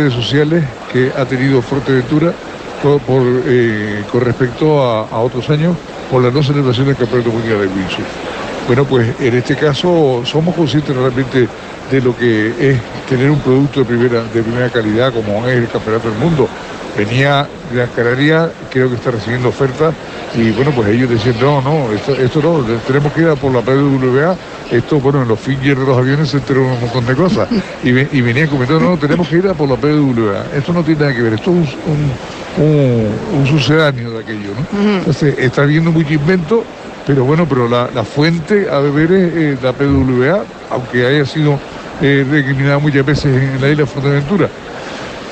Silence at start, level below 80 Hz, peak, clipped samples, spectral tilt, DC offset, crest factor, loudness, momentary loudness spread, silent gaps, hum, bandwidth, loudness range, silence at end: 0 s; -40 dBFS; -2 dBFS; under 0.1%; -7.5 dB/octave; under 0.1%; 12 dB; -13 LUFS; 6 LU; none; none; 8.6 kHz; 1 LU; 0 s